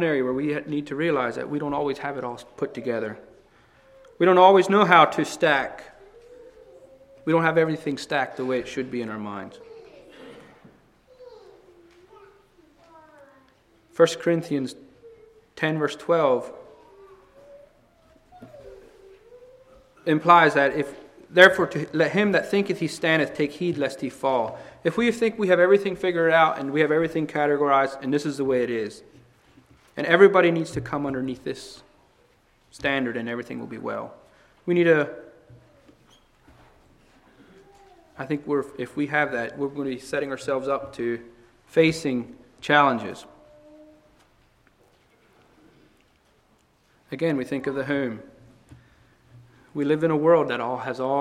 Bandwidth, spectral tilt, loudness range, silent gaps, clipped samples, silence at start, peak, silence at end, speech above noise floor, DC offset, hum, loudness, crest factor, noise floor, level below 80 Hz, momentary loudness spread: 14 kHz; -5.5 dB/octave; 11 LU; none; under 0.1%; 0 s; 0 dBFS; 0 s; 40 dB; under 0.1%; none; -23 LUFS; 24 dB; -62 dBFS; -62 dBFS; 17 LU